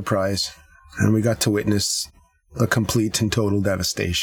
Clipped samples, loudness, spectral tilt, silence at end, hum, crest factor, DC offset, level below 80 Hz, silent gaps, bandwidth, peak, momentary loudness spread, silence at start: under 0.1%; -21 LUFS; -4.5 dB/octave; 0 s; none; 20 dB; under 0.1%; -44 dBFS; none; 19.5 kHz; -2 dBFS; 7 LU; 0 s